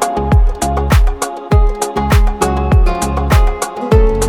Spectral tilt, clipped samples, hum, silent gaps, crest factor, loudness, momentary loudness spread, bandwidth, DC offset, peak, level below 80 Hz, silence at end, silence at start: -6 dB/octave; under 0.1%; none; none; 12 dB; -14 LUFS; 5 LU; 16.5 kHz; under 0.1%; 0 dBFS; -14 dBFS; 0 s; 0 s